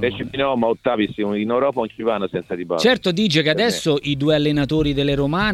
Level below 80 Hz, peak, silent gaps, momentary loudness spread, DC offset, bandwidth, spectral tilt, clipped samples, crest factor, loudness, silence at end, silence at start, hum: -42 dBFS; -2 dBFS; none; 6 LU; under 0.1%; 14 kHz; -5.5 dB/octave; under 0.1%; 16 dB; -19 LUFS; 0 s; 0 s; none